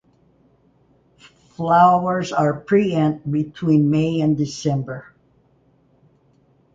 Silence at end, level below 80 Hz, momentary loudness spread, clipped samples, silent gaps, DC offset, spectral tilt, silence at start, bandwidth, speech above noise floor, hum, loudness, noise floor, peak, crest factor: 1.75 s; -56 dBFS; 10 LU; under 0.1%; none; under 0.1%; -7.5 dB/octave; 1.6 s; 7.8 kHz; 40 dB; none; -19 LUFS; -58 dBFS; -2 dBFS; 18 dB